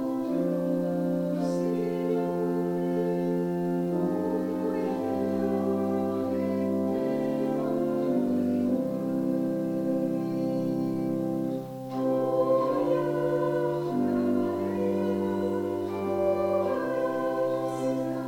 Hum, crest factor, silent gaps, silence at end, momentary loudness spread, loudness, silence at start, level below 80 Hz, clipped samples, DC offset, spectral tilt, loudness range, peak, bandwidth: none; 14 dB; none; 0 s; 3 LU; -28 LUFS; 0 s; -66 dBFS; under 0.1%; under 0.1%; -8.5 dB/octave; 1 LU; -14 dBFS; 16.5 kHz